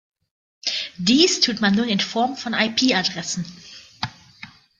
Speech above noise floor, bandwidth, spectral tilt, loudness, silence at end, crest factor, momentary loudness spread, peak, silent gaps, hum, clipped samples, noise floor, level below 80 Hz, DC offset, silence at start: 24 dB; 9.4 kHz; -3 dB/octave; -20 LUFS; 0.3 s; 20 dB; 15 LU; -2 dBFS; none; none; under 0.1%; -45 dBFS; -60 dBFS; under 0.1%; 0.65 s